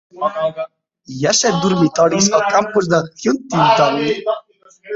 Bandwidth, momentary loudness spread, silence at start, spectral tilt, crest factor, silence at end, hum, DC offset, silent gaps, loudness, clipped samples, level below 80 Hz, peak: 8 kHz; 10 LU; 0.15 s; -4 dB/octave; 16 dB; 0 s; none; under 0.1%; none; -16 LUFS; under 0.1%; -56 dBFS; 0 dBFS